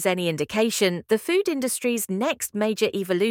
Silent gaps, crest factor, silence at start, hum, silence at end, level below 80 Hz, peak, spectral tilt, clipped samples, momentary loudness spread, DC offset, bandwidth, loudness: none; 18 dB; 0 s; none; 0 s; -66 dBFS; -6 dBFS; -4 dB/octave; under 0.1%; 3 LU; under 0.1%; 18 kHz; -24 LUFS